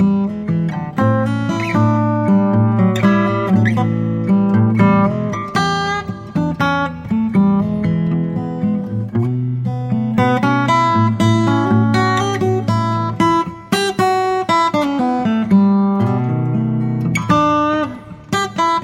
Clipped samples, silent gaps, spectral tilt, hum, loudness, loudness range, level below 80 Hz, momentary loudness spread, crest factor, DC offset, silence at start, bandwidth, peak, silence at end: under 0.1%; none; -7 dB/octave; none; -16 LUFS; 3 LU; -46 dBFS; 6 LU; 14 dB; under 0.1%; 0 s; 13.5 kHz; 0 dBFS; 0 s